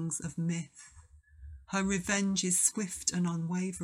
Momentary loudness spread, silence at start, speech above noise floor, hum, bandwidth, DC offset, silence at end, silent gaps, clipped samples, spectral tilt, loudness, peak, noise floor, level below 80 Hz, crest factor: 10 LU; 0 s; 24 dB; none; 15 kHz; under 0.1%; 0 s; none; under 0.1%; -3.5 dB/octave; -31 LUFS; -12 dBFS; -56 dBFS; -56 dBFS; 20 dB